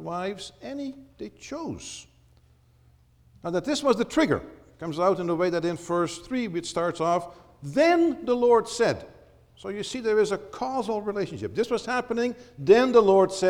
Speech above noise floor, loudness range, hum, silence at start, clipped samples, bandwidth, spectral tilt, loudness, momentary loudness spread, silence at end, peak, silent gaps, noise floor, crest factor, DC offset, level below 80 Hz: 34 dB; 7 LU; none; 0 s; under 0.1%; 13 kHz; -5 dB/octave; -25 LUFS; 17 LU; 0 s; -6 dBFS; none; -59 dBFS; 20 dB; under 0.1%; -58 dBFS